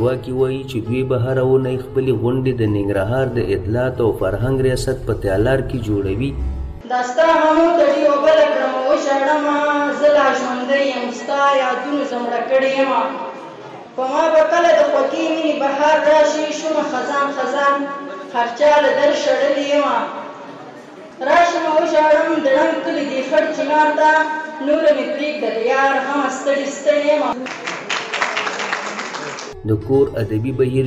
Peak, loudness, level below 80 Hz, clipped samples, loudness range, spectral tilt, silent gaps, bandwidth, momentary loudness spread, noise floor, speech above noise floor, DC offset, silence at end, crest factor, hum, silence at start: -4 dBFS; -17 LUFS; -38 dBFS; under 0.1%; 4 LU; -5.5 dB/octave; none; 12 kHz; 11 LU; -37 dBFS; 20 dB; under 0.1%; 0 s; 12 dB; none; 0 s